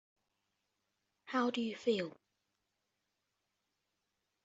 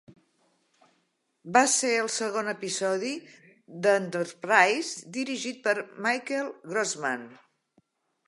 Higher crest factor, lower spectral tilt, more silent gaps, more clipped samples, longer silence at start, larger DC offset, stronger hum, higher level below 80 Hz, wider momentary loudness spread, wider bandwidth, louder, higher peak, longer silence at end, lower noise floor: about the same, 22 dB vs 24 dB; about the same, -3 dB/octave vs -2.5 dB/octave; neither; neither; first, 1.25 s vs 0.1 s; neither; neither; about the same, -86 dBFS vs -82 dBFS; second, 4 LU vs 12 LU; second, 8 kHz vs 11.5 kHz; second, -37 LUFS vs -27 LUFS; second, -20 dBFS vs -4 dBFS; first, 2.35 s vs 0.9 s; first, -86 dBFS vs -74 dBFS